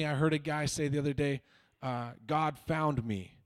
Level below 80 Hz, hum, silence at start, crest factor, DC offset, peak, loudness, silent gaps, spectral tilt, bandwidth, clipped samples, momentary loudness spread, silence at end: -58 dBFS; none; 0 s; 16 dB; under 0.1%; -18 dBFS; -33 LUFS; none; -6 dB/octave; 14 kHz; under 0.1%; 9 LU; 0.2 s